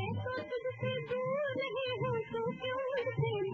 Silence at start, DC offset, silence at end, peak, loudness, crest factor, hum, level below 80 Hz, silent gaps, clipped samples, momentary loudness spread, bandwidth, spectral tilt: 0 s; under 0.1%; 0 s; -22 dBFS; -36 LUFS; 12 dB; none; -70 dBFS; none; under 0.1%; 3 LU; 6.6 kHz; -7.5 dB/octave